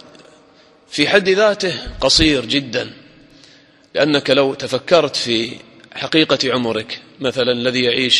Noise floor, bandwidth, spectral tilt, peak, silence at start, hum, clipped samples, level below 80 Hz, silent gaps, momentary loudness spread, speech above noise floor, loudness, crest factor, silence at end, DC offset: -49 dBFS; 12 kHz; -3.5 dB/octave; 0 dBFS; 0.9 s; none; under 0.1%; -40 dBFS; none; 14 LU; 33 dB; -16 LUFS; 18 dB; 0 s; under 0.1%